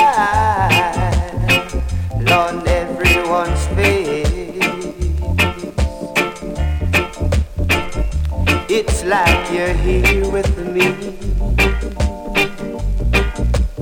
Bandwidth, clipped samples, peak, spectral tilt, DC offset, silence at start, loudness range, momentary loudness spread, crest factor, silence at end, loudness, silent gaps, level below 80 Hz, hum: 17 kHz; under 0.1%; 0 dBFS; -5 dB/octave; under 0.1%; 0 s; 3 LU; 8 LU; 16 dB; 0 s; -17 LUFS; none; -22 dBFS; none